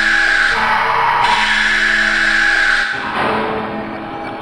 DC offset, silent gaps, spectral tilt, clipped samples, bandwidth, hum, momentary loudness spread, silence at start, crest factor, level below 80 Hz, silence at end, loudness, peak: 0.2%; none; -2.5 dB/octave; under 0.1%; 16 kHz; none; 12 LU; 0 s; 14 dB; -36 dBFS; 0 s; -13 LUFS; -2 dBFS